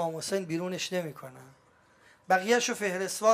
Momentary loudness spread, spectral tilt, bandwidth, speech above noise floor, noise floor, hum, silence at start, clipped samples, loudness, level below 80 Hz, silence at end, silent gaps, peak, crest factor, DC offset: 14 LU; -3.5 dB/octave; 15.5 kHz; 33 dB; -62 dBFS; none; 0 s; under 0.1%; -29 LUFS; -78 dBFS; 0 s; none; -10 dBFS; 20 dB; under 0.1%